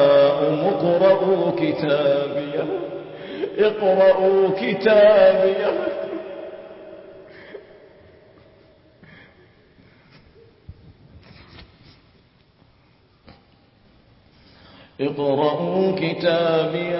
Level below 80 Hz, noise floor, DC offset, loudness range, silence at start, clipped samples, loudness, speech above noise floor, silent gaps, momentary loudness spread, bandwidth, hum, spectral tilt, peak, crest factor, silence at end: -58 dBFS; -56 dBFS; under 0.1%; 17 LU; 0 s; under 0.1%; -19 LUFS; 39 dB; none; 21 LU; 5.8 kHz; none; -10.5 dB/octave; -4 dBFS; 18 dB; 0 s